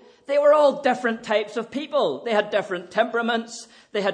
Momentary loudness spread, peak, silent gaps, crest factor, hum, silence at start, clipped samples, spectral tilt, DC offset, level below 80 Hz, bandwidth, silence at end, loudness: 12 LU; -6 dBFS; none; 16 dB; none; 0.3 s; under 0.1%; -4 dB/octave; under 0.1%; -76 dBFS; 9.8 kHz; 0 s; -22 LUFS